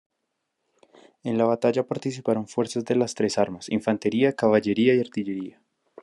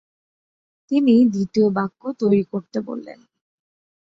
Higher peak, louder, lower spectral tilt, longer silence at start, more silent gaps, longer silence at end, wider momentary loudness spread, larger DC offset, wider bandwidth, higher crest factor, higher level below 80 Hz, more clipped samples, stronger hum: about the same, -6 dBFS vs -6 dBFS; second, -24 LUFS vs -20 LUFS; second, -6 dB/octave vs -8 dB/octave; first, 1.25 s vs 0.9 s; neither; second, 0.55 s vs 1 s; second, 9 LU vs 13 LU; neither; first, 11.5 kHz vs 7.4 kHz; about the same, 18 dB vs 16 dB; second, -72 dBFS vs -64 dBFS; neither; neither